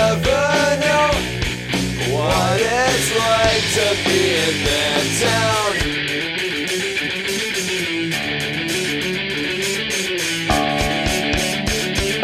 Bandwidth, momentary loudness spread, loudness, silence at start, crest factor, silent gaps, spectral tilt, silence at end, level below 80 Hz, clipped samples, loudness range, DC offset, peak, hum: 16 kHz; 5 LU; -18 LUFS; 0 s; 18 dB; none; -3 dB/octave; 0 s; -36 dBFS; under 0.1%; 4 LU; under 0.1%; 0 dBFS; none